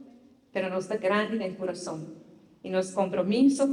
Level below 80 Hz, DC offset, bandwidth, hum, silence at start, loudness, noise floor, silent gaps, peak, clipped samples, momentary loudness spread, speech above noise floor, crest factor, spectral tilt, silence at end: -72 dBFS; under 0.1%; 11 kHz; none; 0 s; -28 LUFS; -55 dBFS; none; -12 dBFS; under 0.1%; 15 LU; 28 dB; 16 dB; -5.5 dB/octave; 0 s